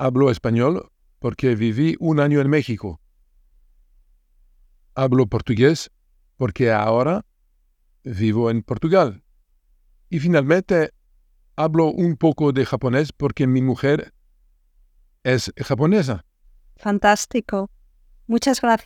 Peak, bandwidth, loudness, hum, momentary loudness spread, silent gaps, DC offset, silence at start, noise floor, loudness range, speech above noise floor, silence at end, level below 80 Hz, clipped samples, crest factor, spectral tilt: -2 dBFS; 15.5 kHz; -20 LUFS; none; 11 LU; none; under 0.1%; 0 s; -62 dBFS; 3 LU; 43 dB; 0.05 s; -48 dBFS; under 0.1%; 18 dB; -6.5 dB/octave